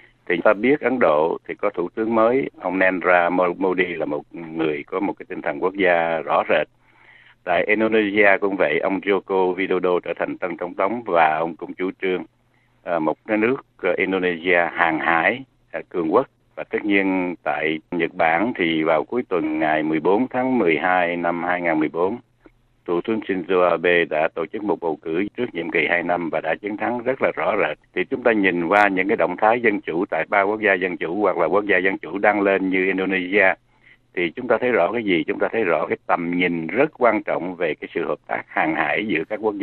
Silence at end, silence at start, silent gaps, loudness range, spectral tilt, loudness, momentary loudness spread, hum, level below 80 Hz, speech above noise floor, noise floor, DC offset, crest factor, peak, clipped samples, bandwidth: 0 s; 0.3 s; none; 3 LU; -8 dB/octave; -20 LUFS; 8 LU; none; -60 dBFS; 35 dB; -55 dBFS; under 0.1%; 20 dB; 0 dBFS; under 0.1%; 4.4 kHz